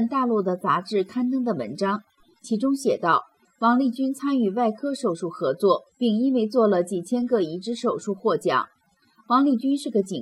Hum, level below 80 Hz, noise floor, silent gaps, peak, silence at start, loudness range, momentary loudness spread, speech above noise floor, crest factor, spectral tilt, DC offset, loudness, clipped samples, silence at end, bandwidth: none; -76 dBFS; -61 dBFS; none; -6 dBFS; 0 s; 1 LU; 6 LU; 38 dB; 16 dB; -6 dB/octave; under 0.1%; -24 LUFS; under 0.1%; 0 s; 13.5 kHz